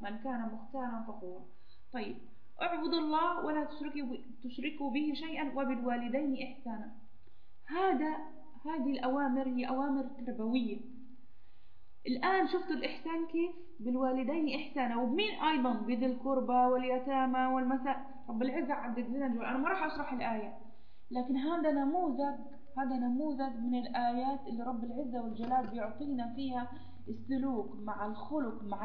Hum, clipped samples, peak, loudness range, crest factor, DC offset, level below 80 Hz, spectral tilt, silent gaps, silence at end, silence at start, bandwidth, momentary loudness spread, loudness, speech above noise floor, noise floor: none; under 0.1%; -18 dBFS; 5 LU; 18 dB; 0.8%; -68 dBFS; -3 dB/octave; none; 0 s; 0 s; 5.2 kHz; 12 LU; -35 LUFS; 29 dB; -64 dBFS